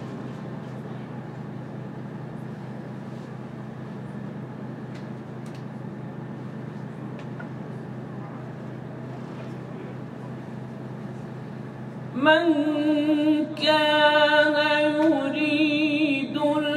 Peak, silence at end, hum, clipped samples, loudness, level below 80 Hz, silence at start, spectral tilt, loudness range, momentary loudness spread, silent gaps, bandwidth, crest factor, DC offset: -6 dBFS; 0 s; none; under 0.1%; -24 LUFS; -66 dBFS; 0 s; -6 dB/octave; 16 LU; 18 LU; none; 10.5 kHz; 20 dB; under 0.1%